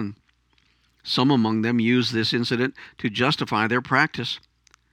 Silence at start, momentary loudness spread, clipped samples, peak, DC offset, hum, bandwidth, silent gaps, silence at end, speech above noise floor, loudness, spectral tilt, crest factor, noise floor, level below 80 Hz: 0 s; 10 LU; under 0.1%; -4 dBFS; under 0.1%; none; 12.5 kHz; none; 0.55 s; 42 dB; -22 LUFS; -5.5 dB/octave; 20 dB; -64 dBFS; -64 dBFS